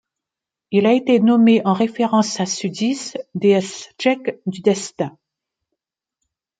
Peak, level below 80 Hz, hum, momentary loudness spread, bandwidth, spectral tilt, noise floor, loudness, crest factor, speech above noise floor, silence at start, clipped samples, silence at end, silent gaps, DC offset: -2 dBFS; -68 dBFS; none; 12 LU; 9.2 kHz; -5 dB/octave; -86 dBFS; -18 LUFS; 16 dB; 69 dB; 0.7 s; under 0.1%; 1.5 s; none; under 0.1%